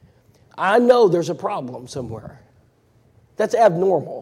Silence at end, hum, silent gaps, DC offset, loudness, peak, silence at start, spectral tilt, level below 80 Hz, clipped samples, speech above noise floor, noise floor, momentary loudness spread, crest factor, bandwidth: 0 s; none; none; under 0.1%; -18 LUFS; -2 dBFS; 0.55 s; -6 dB/octave; -58 dBFS; under 0.1%; 39 dB; -57 dBFS; 17 LU; 18 dB; 13.5 kHz